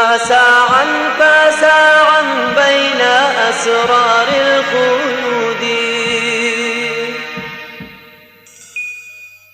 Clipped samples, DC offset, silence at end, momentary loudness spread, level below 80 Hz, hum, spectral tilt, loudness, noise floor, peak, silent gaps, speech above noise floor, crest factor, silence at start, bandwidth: under 0.1%; under 0.1%; 0.25 s; 16 LU; -56 dBFS; none; -2 dB/octave; -11 LUFS; -42 dBFS; 0 dBFS; none; 30 dB; 12 dB; 0 s; 14 kHz